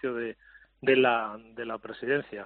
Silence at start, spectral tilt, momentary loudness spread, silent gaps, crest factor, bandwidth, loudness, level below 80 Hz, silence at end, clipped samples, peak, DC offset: 0.05 s; -2.5 dB/octave; 15 LU; none; 18 dB; 4.4 kHz; -28 LUFS; -68 dBFS; 0 s; under 0.1%; -10 dBFS; under 0.1%